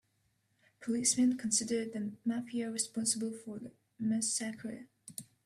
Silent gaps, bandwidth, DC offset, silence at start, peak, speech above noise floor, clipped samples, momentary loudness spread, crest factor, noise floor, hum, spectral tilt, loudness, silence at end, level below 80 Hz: none; 14 kHz; under 0.1%; 0.8 s; -16 dBFS; 42 dB; under 0.1%; 18 LU; 20 dB; -77 dBFS; none; -3 dB/octave; -33 LUFS; 0.2 s; -78 dBFS